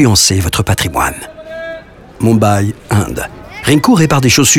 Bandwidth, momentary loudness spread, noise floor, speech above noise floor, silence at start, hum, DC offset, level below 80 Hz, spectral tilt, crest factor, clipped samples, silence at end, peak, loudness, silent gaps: 18 kHz; 17 LU; -31 dBFS; 20 dB; 0 s; none; under 0.1%; -34 dBFS; -4 dB/octave; 12 dB; under 0.1%; 0 s; 0 dBFS; -12 LUFS; none